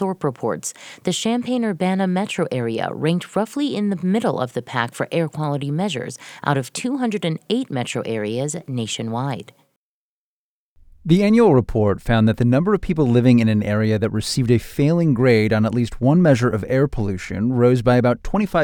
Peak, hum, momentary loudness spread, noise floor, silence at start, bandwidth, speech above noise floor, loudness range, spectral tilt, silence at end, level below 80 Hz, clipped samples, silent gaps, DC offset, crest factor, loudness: -2 dBFS; none; 10 LU; under -90 dBFS; 0 s; 17.5 kHz; over 71 dB; 7 LU; -6.5 dB/octave; 0 s; -42 dBFS; under 0.1%; 9.76-10.76 s; under 0.1%; 18 dB; -20 LUFS